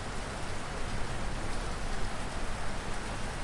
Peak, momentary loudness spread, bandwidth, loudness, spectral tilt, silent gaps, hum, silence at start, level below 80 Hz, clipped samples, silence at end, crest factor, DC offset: -20 dBFS; 1 LU; 11.5 kHz; -38 LUFS; -4 dB/octave; none; none; 0 s; -38 dBFS; under 0.1%; 0 s; 14 dB; under 0.1%